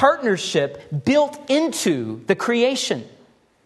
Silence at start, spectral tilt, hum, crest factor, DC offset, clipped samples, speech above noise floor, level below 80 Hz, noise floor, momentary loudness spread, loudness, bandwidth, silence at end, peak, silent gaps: 0 s; -4 dB/octave; none; 18 dB; under 0.1%; under 0.1%; 35 dB; -64 dBFS; -55 dBFS; 7 LU; -21 LUFS; 13 kHz; 0.55 s; -2 dBFS; none